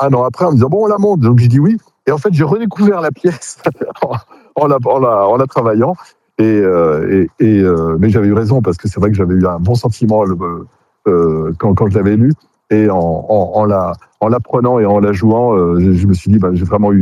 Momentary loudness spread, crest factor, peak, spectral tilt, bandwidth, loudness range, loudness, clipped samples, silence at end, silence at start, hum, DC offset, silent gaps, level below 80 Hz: 8 LU; 12 dB; 0 dBFS; -9 dB/octave; 11.5 kHz; 2 LU; -12 LUFS; under 0.1%; 0 s; 0 s; none; under 0.1%; none; -40 dBFS